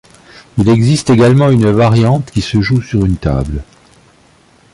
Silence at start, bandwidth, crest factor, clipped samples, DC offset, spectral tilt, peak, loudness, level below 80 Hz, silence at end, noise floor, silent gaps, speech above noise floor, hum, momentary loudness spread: 0.55 s; 11.5 kHz; 12 dB; under 0.1%; under 0.1%; -7 dB/octave; 0 dBFS; -11 LUFS; -30 dBFS; 1.1 s; -47 dBFS; none; 37 dB; none; 9 LU